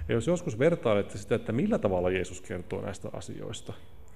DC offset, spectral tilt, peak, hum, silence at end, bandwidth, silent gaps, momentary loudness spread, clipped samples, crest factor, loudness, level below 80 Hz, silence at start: 0.7%; -6.5 dB/octave; -12 dBFS; none; 0.05 s; 15 kHz; none; 14 LU; under 0.1%; 18 dB; -30 LUFS; -50 dBFS; 0 s